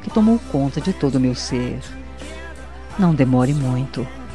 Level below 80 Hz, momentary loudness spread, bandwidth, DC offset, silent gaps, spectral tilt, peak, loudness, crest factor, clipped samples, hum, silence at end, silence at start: -38 dBFS; 18 LU; 11.5 kHz; 1%; none; -7 dB/octave; -4 dBFS; -19 LUFS; 16 dB; under 0.1%; none; 0 s; 0 s